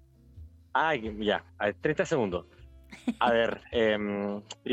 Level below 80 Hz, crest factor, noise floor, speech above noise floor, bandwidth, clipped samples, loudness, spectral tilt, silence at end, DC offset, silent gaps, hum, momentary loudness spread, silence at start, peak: -54 dBFS; 18 dB; -51 dBFS; 22 dB; 9.6 kHz; under 0.1%; -29 LUFS; -5.5 dB/octave; 0 s; under 0.1%; none; none; 10 LU; 0.35 s; -12 dBFS